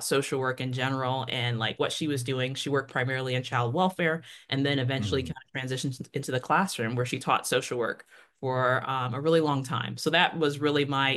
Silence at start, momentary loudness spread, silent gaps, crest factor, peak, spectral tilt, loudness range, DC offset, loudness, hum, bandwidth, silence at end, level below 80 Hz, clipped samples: 0 s; 7 LU; none; 20 dB; -8 dBFS; -4.5 dB/octave; 2 LU; under 0.1%; -28 LUFS; none; 12.5 kHz; 0 s; -64 dBFS; under 0.1%